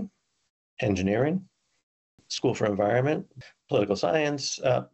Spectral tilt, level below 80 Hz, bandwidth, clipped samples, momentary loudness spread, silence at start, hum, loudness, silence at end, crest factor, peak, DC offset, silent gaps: -5.5 dB/octave; -62 dBFS; 8.2 kHz; under 0.1%; 9 LU; 0 s; none; -27 LUFS; 0.1 s; 18 dB; -10 dBFS; under 0.1%; 0.50-0.77 s, 1.83-2.18 s